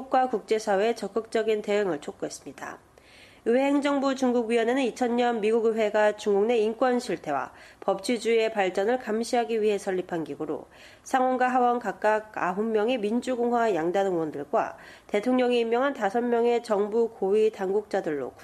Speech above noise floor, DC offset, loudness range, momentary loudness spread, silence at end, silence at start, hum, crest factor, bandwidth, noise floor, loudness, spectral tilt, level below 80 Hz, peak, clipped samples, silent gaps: 27 dB; under 0.1%; 3 LU; 9 LU; 0 s; 0 s; none; 14 dB; 13 kHz; -53 dBFS; -26 LUFS; -5 dB/octave; -68 dBFS; -10 dBFS; under 0.1%; none